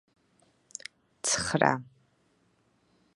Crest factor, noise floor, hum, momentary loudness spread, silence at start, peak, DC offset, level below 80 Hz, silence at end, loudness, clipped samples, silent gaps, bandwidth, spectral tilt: 30 dB; -69 dBFS; none; 19 LU; 1.25 s; -4 dBFS; under 0.1%; -62 dBFS; 1.3 s; -28 LUFS; under 0.1%; none; 11.5 kHz; -3 dB/octave